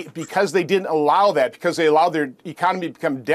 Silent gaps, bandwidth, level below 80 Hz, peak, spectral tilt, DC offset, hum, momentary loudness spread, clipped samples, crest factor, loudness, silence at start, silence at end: none; 14.5 kHz; -72 dBFS; -4 dBFS; -5 dB/octave; under 0.1%; none; 9 LU; under 0.1%; 16 dB; -20 LUFS; 0 s; 0 s